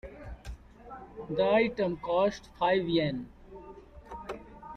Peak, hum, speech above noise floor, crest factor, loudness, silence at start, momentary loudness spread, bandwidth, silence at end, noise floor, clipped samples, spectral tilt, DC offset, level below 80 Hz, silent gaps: -14 dBFS; none; 21 dB; 18 dB; -29 LUFS; 0.05 s; 22 LU; 9.4 kHz; 0 s; -49 dBFS; under 0.1%; -6.5 dB/octave; under 0.1%; -52 dBFS; none